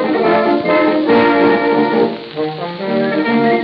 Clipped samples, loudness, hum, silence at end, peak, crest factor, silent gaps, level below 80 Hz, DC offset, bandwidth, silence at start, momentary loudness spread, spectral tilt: under 0.1%; -14 LUFS; none; 0 s; 0 dBFS; 12 dB; none; -56 dBFS; under 0.1%; 5.6 kHz; 0 s; 10 LU; -8.5 dB/octave